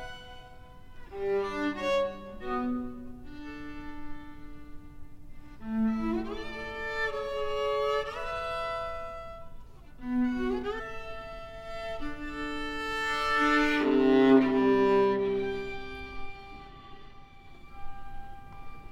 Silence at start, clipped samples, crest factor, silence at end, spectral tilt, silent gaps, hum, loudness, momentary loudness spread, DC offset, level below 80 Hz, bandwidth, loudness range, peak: 0 s; under 0.1%; 22 dB; 0 s; -5.5 dB/octave; none; none; -29 LUFS; 24 LU; under 0.1%; -46 dBFS; 13 kHz; 13 LU; -10 dBFS